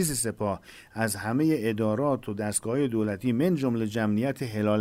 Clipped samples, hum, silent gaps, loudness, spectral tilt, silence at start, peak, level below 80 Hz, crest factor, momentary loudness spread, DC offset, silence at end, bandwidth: under 0.1%; none; none; -27 LUFS; -5.5 dB/octave; 0 s; -14 dBFS; -58 dBFS; 14 dB; 5 LU; under 0.1%; 0 s; 16 kHz